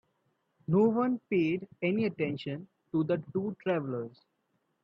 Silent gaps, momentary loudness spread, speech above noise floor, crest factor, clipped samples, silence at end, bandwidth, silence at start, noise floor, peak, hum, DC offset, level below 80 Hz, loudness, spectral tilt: none; 12 LU; 47 dB; 16 dB; under 0.1%; 0.75 s; 6.2 kHz; 0.7 s; -77 dBFS; -14 dBFS; none; under 0.1%; -72 dBFS; -31 LUFS; -9.5 dB/octave